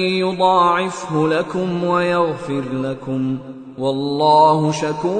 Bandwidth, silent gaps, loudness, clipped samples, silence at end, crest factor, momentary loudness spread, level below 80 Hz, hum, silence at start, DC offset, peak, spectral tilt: 9.4 kHz; none; -18 LUFS; under 0.1%; 0 s; 16 dB; 11 LU; -56 dBFS; none; 0 s; under 0.1%; -2 dBFS; -6 dB/octave